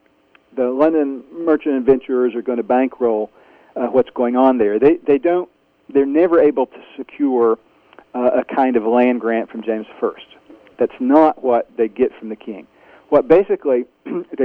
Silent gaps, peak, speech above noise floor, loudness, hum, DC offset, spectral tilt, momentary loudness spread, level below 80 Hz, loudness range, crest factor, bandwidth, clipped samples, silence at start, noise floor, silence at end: none; 0 dBFS; 39 dB; -17 LUFS; none; under 0.1%; -9 dB/octave; 14 LU; -56 dBFS; 3 LU; 18 dB; 4.6 kHz; under 0.1%; 0.55 s; -55 dBFS; 0 s